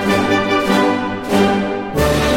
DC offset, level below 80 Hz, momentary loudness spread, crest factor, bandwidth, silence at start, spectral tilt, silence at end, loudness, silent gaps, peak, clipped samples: under 0.1%; -32 dBFS; 4 LU; 14 dB; 16.5 kHz; 0 s; -5 dB/octave; 0 s; -16 LUFS; none; -2 dBFS; under 0.1%